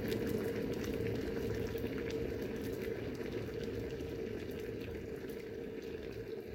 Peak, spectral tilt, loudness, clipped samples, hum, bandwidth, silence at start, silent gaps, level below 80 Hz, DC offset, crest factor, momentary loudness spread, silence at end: -20 dBFS; -6.5 dB/octave; -41 LUFS; under 0.1%; none; 17 kHz; 0 s; none; -54 dBFS; under 0.1%; 18 dB; 7 LU; 0 s